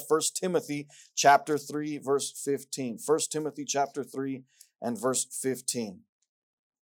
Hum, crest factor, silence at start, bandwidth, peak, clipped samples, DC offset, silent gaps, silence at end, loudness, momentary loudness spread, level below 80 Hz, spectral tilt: none; 22 dB; 0 s; 18.5 kHz; -8 dBFS; under 0.1%; under 0.1%; none; 0.85 s; -29 LUFS; 12 LU; -84 dBFS; -3 dB/octave